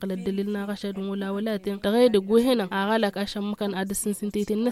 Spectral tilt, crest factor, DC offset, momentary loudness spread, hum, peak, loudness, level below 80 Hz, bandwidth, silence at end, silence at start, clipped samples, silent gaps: -5 dB/octave; 16 dB; under 0.1%; 9 LU; none; -8 dBFS; -25 LUFS; -56 dBFS; 15.5 kHz; 0 s; 0 s; under 0.1%; none